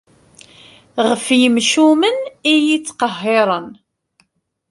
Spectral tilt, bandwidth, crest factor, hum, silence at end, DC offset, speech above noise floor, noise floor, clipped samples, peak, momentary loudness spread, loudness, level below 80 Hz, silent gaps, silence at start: -3 dB/octave; 11.5 kHz; 16 dB; none; 1 s; under 0.1%; 50 dB; -65 dBFS; under 0.1%; -2 dBFS; 9 LU; -15 LUFS; -64 dBFS; none; 0.95 s